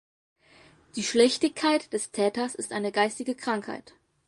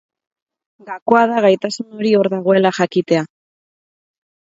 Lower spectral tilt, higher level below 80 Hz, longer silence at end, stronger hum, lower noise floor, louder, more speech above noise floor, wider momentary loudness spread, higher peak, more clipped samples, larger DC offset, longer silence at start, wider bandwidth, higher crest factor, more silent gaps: second, -3 dB/octave vs -6 dB/octave; about the same, -70 dBFS vs -66 dBFS; second, 0.5 s vs 1.25 s; neither; second, -57 dBFS vs under -90 dBFS; second, -27 LUFS vs -16 LUFS; second, 30 dB vs over 75 dB; about the same, 10 LU vs 11 LU; second, -8 dBFS vs 0 dBFS; neither; neither; about the same, 0.95 s vs 0.85 s; first, 11.5 kHz vs 7.8 kHz; about the same, 22 dB vs 18 dB; second, none vs 1.02-1.06 s